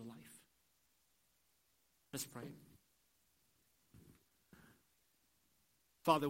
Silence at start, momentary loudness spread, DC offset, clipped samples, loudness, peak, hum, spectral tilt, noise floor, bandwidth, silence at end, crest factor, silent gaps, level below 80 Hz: 0 s; 24 LU; under 0.1%; under 0.1%; -44 LUFS; -18 dBFS; none; -4.5 dB/octave; -79 dBFS; 16 kHz; 0 s; 28 dB; none; -82 dBFS